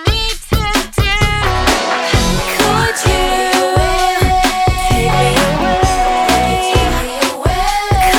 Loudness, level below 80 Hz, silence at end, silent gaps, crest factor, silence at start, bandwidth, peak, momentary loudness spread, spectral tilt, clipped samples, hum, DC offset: -13 LUFS; -20 dBFS; 0 s; none; 12 dB; 0 s; over 20 kHz; 0 dBFS; 3 LU; -4 dB/octave; under 0.1%; none; under 0.1%